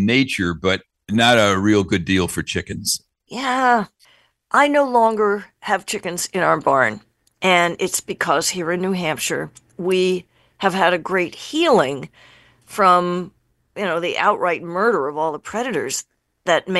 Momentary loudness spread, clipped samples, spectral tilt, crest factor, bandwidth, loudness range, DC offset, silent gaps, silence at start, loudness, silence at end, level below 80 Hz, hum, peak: 11 LU; under 0.1%; -4 dB/octave; 20 dB; 13 kHz; 2 LU; under 0.1%; none; 0 s; -19 LUFS; 0 s; -54 dBFS; none; 0 dBFS